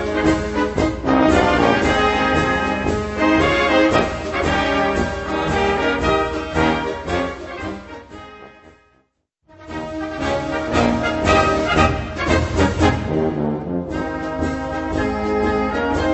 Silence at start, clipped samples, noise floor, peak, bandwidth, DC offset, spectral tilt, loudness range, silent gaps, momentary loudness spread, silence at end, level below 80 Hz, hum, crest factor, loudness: 0 s; under 0.1%; -65 dBFS; -2 dBFS; 8.4 kHz; under 0.1%; -5.5 dB/octave; 9 LU; none; 11 LU; 0 s; -32 dBFS; none; 18 dB; -19 LUFS